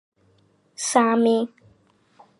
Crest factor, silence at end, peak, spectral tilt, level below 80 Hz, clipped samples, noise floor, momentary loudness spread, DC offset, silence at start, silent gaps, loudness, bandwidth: 22 dB; 0.95 s; -4 dBFS; -3.5 dB/octave; -74 dBFS; under 0.1%; -61 dBFS; 11 LU; under 0.1%; 0.8 s; none; -21 LUFS; 11.5 kHz